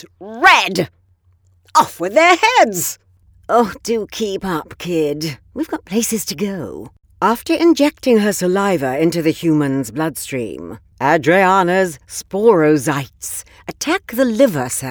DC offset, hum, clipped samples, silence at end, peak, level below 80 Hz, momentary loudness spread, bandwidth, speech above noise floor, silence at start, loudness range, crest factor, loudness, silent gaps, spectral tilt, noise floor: under 0.1%; none; under 0.1%; 0 s; 0 dBFS; -52 dBFS; 14 LU; over 20 kHz; 39 dB; 0.2 s; 5 LU; 16 dB; -16 LUFS; none; -4 dB/octave; -55 dBFS